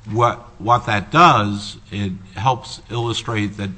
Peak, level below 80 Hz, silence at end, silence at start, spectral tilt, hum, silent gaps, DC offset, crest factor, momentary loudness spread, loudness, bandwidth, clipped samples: 0 dBFS; -46 dBFS; 0 s; 0.05 s; -5.5 dB/octave; none; none; under 0.1%; 18 dB; 15 LU; -18 LUFS; 8.6 kHz; under 0.1%